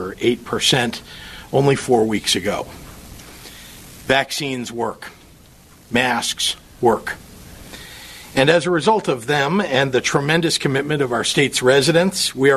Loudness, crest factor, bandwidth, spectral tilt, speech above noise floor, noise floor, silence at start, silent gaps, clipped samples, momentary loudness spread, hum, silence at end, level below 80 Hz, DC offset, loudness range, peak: -18 LUFS; 18 dB; 13.5 kHz; -4 dB/octave; 29 dB; -46 dBFS; 0 s; none; under 0.1%; 21 LU; none; 0 s; -48 dBFS; under 0.1%; 6 LU; -2 dBFS